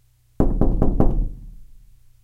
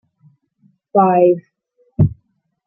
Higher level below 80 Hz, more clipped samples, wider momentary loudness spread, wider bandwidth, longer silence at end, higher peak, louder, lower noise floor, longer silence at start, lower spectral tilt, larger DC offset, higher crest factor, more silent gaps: first, -22 dBFS vs -42 dBFS; neither; about the same, 11 LU vs 10 LU; second, 1.9 kHz vs 3.2 kHz; about the same, 0.6 s vs 0.55 s; about the same, 0 dBFS vs -2 dBFS; second, -23 LUFS vs -16 LUFS; second, -47 dBFS vs -64 dBFS; second, 0.4 s vs 0.95 s; second, -11.5 dB/octave vs -13.5 dB/octave; neither; about the same, 20 dB vs 16 dB; neither